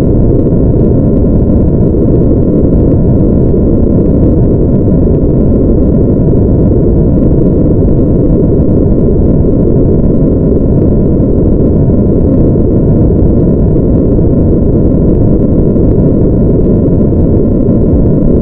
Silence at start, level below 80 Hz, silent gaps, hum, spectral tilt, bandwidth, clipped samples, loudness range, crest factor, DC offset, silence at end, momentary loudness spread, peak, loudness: 0 s; -12 dBFS; none; none; -15.5 dB/octave; 2.6 kHz; 0.3%; 0 LU; 6 dB; under 0.1%; 0 s; 1 LU; 0 dBFS; -8 LUFS